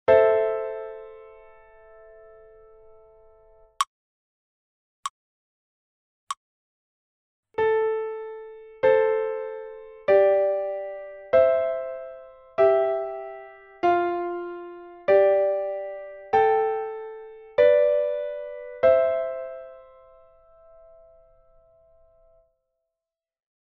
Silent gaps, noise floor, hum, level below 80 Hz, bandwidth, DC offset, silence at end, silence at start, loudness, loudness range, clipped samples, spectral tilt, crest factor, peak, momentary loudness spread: 3.87-5.03 s, 5.10-6.27 s, 6.37-7.43 s; -89 dBFS; none; -62 dBFS; 8 kHz; under 0.1%; 3.8 s; 0.1 s; -23 LUFS; 15 LU; under 0.1%; -3 dB/octave; 20 dB; -6 dBFS; 20 LU